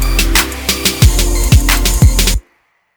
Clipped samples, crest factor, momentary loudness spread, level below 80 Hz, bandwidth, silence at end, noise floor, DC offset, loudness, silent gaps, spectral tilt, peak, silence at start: 0.4%; 12 dB; 5 LU; -14 dBFS; over 20 kHz; 0.55 s; -57 dBFS; under 0.1%; -12 LUFS; none; -3.5 dB/octave; 0 dBFS; 0 s